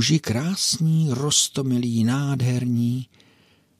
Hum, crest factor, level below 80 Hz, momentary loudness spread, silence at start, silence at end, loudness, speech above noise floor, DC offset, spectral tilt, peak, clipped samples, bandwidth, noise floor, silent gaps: none; 16 dB; -62 dBFS; 6 LU; 0 s; 0.75 s; -22 LUFS; 37 dB; under 0.1%; -4.5 dB/octave; -6 dBFS; under 0.1%; 15.5 kHz; -58 dBFS; none